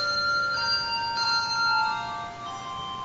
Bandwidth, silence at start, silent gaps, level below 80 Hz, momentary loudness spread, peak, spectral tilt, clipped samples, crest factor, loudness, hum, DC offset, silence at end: 8 kHz; 0 s; none; -58 dBFS; 11 LU; -14 dBFS; -1.5 dB/octave; under 0.1%; 14 dB; -25 LUFS; none; under 0.1%; 0 s